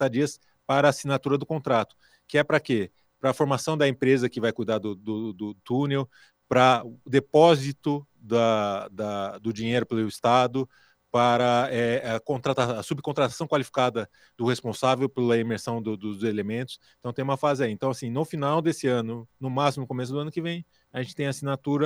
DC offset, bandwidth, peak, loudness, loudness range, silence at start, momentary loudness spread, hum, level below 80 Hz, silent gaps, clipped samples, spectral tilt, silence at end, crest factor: under 0.1%; over 20 kHz; -4 dBFS; -26 LUFS; 4 LU; 0 s; 11 LU; none; -66 dBFS; none; under 0.1%; -6 dB/octave; 0 s; 22 dB